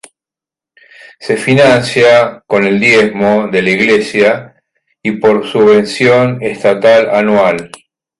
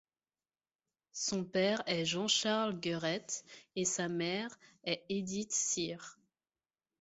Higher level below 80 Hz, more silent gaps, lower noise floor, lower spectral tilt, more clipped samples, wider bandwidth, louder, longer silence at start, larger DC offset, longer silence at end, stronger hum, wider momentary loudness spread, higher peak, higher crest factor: first, -50 dBFS vs -76 dBFS; neither; about the same, -88 dBFS vs under -90 dBFS; first, -5.5 dB/octave vs -3 dB/octave; neither; first, 11.5 kHz vs 8 kHz; first, -10 LUFS vs -35 LUFS; about the same, 1.2 s vs 1.15 s; neither; second, 0.55 s vs 0.9 s; neither; second, 8 LU vs 13 LU; first, 0 dBFS vs -18 dBFS; second, 10 dB vs 20 dB